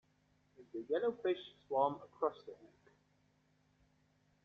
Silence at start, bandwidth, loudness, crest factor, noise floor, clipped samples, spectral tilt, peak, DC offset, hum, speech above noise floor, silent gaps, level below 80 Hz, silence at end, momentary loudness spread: 0.6 s; 6.8 kHz; -39 LUFS; 22 dB; -75 dBFS; under 0.1%; -4 dB/octave; -20 dBFS; under 0.1%; none; 36 dB; none; -82 dBFS; 1.8 s; 14 LU